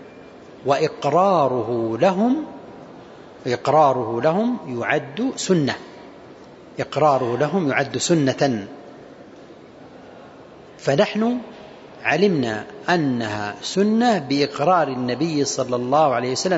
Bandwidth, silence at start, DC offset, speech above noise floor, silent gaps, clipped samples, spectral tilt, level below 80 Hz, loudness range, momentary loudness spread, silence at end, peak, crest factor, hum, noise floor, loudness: 8 kHz; 0 s; under 0.1%; 23 dB; none; under 0.1%; -5 dB/octave; -62 dBFS; 5 LU; 14 LU; 0 s; -4 dBFS; 18 dB; none; -43 dBFS; -20 LUFS